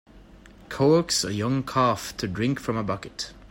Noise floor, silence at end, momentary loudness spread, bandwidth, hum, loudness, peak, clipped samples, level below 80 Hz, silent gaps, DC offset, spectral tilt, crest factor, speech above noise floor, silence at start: -49 dBFS; 0.05 s; 12 LU; 16.5 kHz; none; -25 LUFS; -10 dBFS; under 0.1%; -52 dBFS; none; under 0.1%; -5 dB/octave; 16 dB; 24 dB; 0.15 s